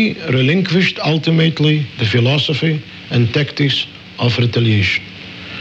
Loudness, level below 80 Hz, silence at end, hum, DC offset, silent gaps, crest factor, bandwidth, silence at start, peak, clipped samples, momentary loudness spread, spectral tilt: -15 LUFS; -50 dBFS; 0 s; none; under 0.1%; none; 12 dB; 7.8 kHz; 0 s; -2 dBFS; under 0.1%; 7 LU; -6.5 dB/octave